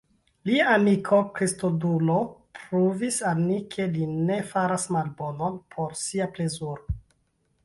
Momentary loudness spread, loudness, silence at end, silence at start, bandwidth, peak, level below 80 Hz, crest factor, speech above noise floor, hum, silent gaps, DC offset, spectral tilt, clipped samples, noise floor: 13 LU; -26 LUFS; 0.65 s; 0.45 s; 11.5 kHz; -8 dBFS; -48 dBFS; 18 dB; 45 dB; none; none; under 0.1%; -5.5 dB/octave; under 0.1%; -70 dBFS